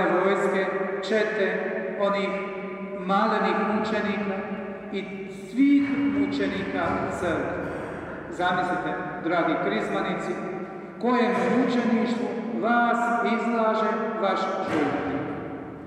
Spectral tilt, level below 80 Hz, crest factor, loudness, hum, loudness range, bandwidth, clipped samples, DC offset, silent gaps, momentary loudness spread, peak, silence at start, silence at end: -6.5 dB/octave; -58 dBFS; 16 dB; -25 LUFS; none; 3 LU; 10.5 kHz; under 0.1%; under 0.1%; none; 11 LU; -10 dBFS; 0 s; 0 s